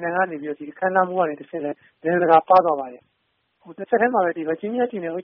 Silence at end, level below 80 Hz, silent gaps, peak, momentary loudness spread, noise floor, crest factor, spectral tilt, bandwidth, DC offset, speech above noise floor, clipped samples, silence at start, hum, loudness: 0 s; -68 dBFS; none; -2 dBFS; 14 LU; -71 dBFS; 20 dB; -4.5 dB/octave; 4.3 kHz; under 0.1%; 50 dB; under 0.1%; 0 s; none; -21 LUFS